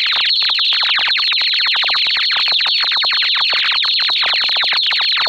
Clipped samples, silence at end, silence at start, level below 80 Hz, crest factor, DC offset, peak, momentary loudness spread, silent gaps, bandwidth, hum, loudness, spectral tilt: under 0.1%; 0 s; 0 s; -62 dBFS; 12 dB; under 0.1%; -2 dBFS; 1 LU; none; 16.5 kHz; none; -12 LUFS; 1.5 dB/octave